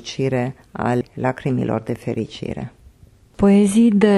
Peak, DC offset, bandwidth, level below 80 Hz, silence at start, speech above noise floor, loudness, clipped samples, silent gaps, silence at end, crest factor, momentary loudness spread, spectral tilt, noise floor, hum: -2 dBFS; under 0.1%; 12 kHz; -46 dBFS; 0.05 s; 32 dB; -19 LUFS; under 0.1%; none; 0 s; 16 dB; 15 LU; -7 dB/octave; -50 dBFS; none